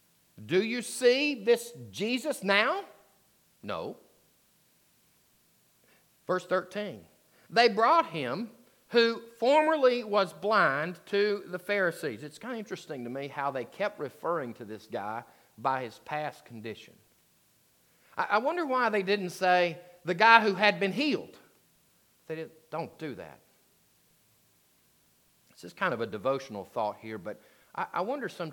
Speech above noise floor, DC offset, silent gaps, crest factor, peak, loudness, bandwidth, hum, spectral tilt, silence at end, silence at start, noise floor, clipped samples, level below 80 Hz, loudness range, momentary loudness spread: 38 dB; under 0.1%; none; 28 dB; -4 dBFS; -29 LUFS; 19 kHz; none; -4.5 dB/octave; 0 s; 0.4 s; -67 dBFS; under 0.1%; -82 dBFS; 15 LU; 17 LU